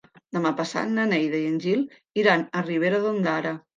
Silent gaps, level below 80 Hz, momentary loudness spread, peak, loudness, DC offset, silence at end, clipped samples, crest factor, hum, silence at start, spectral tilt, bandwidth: none; -74 dBFS; 6 LU; -6 dBFS; -24 LUFS; under 0.1%; 0.2 s; under 0.1%; 20 dB; none; 0.35 s; -6 dB/octave; 9.4 kHz